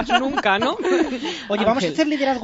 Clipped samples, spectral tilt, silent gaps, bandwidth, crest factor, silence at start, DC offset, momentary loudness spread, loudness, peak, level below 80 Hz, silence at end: under 0.1%; -4.5 dB/octave; none; 8 kHz; 16 dB; 0 s; under 0.1%; 5 LU; -20 LUFS; -4 dBFS; -50 dBFS; 0 s